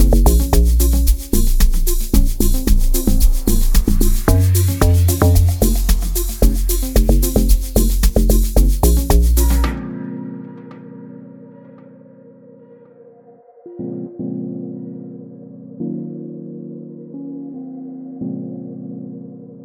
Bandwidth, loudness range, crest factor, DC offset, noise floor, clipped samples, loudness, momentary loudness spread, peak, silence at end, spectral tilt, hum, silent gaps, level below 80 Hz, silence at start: 19 kHz; 16 LU; 14 dB; under 0.1%; -45 dBFS; under 0.1%; -17 LUFS; 19 LU; 0 dBFS; 0 s; -5.5 dB/octave; none; none; -16 dBFS; 0 s